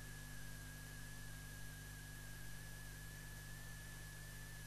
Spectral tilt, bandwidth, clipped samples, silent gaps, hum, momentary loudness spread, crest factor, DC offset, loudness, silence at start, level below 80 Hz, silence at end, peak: -3.5 dB/octave; 13 kHz; under 0.1%; none; 50 Hz at -55 dBFS; 0 LU; 12 dB; 0.1%; -53 LUFS; 0 s; -58 dBFS; 0 s; -38 dBFS